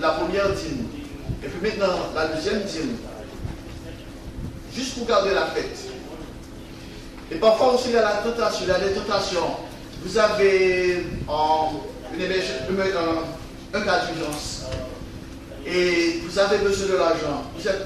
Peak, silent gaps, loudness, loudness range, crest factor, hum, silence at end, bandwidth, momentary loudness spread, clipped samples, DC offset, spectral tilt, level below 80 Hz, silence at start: -6 dBFS; none; -23 LUFS; 6 LU; 18 dB; none; 0 s; 13.5 kHz; 18 LU; under 0.1%; under 0.1%; -4.5 dB/octave; -42 dBFS; 0 s